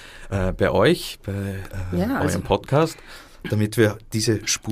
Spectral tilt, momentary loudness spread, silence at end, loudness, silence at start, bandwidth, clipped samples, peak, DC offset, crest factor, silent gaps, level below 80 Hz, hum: -5 dB/octave; 11 LU; 0 s; -22 LUFS; 0 s; 15.5 kHz; under 0.1%; -4 dBFS; under 0.1%; 18 dB; none; -40 dBFS; none